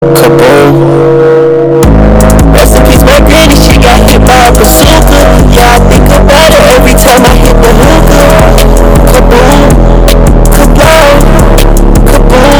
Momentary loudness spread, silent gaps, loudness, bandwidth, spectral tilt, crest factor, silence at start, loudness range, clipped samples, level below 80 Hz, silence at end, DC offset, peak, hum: 3 LU; none; -3 LUFS; over 20 kHz; -5 dB/octave; 2 dB; 0 s; 1 LU; 70%; -6 dBFS; 0 s; under 0.1%; 0 dBFS; none